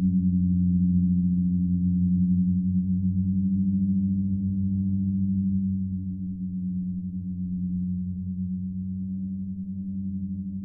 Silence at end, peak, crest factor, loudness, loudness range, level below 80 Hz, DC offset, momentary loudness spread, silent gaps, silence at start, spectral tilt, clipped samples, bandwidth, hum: 0 s; -14 dBFS; 12 dB; -26 LUFS; 7 LU; -48 dBFS; under 0.1%; 9 LU; none; 0 s; -16.5 dB/octave; under 0.1%; 0.6 kHz; none